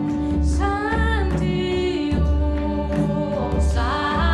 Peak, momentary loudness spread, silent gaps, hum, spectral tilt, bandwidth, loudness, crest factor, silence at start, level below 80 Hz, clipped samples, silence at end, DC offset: -8 dBFS; 2 LU; none; none; -7 dB/octave; 10.5 kHz; -22 LUFS; 12 dB; 0 s; -24 dBFS; under 0.1%; 0 s; under 0.1%